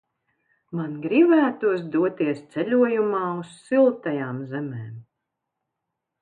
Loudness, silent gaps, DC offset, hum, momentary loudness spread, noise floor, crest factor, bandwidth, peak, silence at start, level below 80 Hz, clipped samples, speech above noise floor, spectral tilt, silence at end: -23 LUFS; none; under 0.1%; none; 14 LU; -82 dBFS; 16 dB; 9.4 kHz; -8 dBFS; 0.7 s; -74 dBFS; under 0.1%; 60 dB; -8 dB/octave; 1.2 s